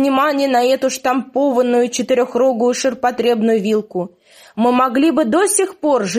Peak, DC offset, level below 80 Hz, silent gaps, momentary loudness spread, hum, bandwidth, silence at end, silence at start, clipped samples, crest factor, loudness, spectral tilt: -2 dBFS; under 0.1%; -62 dBFS; none; 5 LU; none; 15.5 kHz; 0 s; 0 s; under 0.1%; 14 dB; -16 LUFS; -4 dB/octave